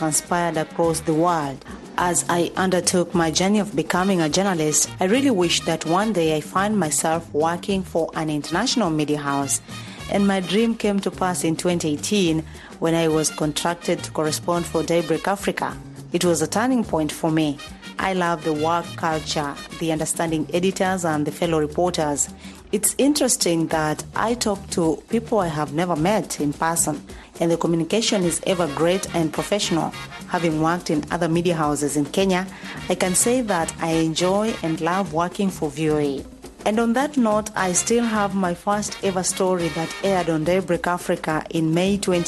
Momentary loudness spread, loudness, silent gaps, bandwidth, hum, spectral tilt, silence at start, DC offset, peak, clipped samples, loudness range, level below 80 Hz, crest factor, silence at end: 6 LU; -21 LUFS; none; 12.5 kHz; none; -4 dB/octave; 0 s; under 0.1%; -4 dBFS; under 0.1%; 3 LU; -48 dBFS; 18 dB; 0 s